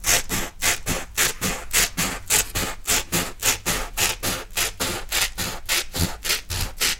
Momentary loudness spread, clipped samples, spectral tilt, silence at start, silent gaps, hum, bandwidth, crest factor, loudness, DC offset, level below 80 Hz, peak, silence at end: 6 LU; under 0.1%; -1 dB/octave; 0 s; none; none; 17 kHz; 22 dB; -22 LUFS; under 0.1%; -36 dBFS; -2 dBFS; 0 s